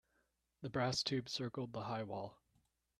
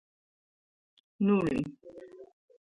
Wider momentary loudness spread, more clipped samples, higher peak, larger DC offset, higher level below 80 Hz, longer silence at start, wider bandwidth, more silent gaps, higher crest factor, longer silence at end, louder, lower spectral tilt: second, 11 LU vs 23 LU; neither; second, -24 dBFS vs -16 dBFS; neither; second, -74 dBFS vs -64 dBFS; second, 0.6 s vs 1.2 s; first, 13 kHz vs 8.2 kHz; neither; about the same, 20 dB vs 18 dB; first, 0.65 s vs 0.45 s; second, -41 LUFS vs -30 LUFS; second, -4.5 dB/octave vs -8.5 dB/octave